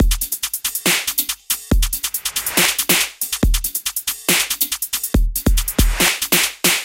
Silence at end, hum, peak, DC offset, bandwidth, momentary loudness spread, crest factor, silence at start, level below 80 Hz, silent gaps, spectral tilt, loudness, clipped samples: 0 s; none; 0 dBFS; under 0.1%; 17.5 kHz; 6 LU; 18 dB; 0 s; -24 dBFS; none; -2 dB/octave; -17 LUFS; under 0.1%